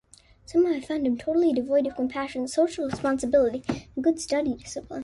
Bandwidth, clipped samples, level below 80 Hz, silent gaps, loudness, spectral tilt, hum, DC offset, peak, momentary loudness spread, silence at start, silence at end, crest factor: 11.5 kHz; under 0.1%; -54 dBFS; none; -26 LUFS; -5 dB/octave; none; under 0.1%; -10 dBFS; 8 LU; 0.5 s; 0 s; 16 dB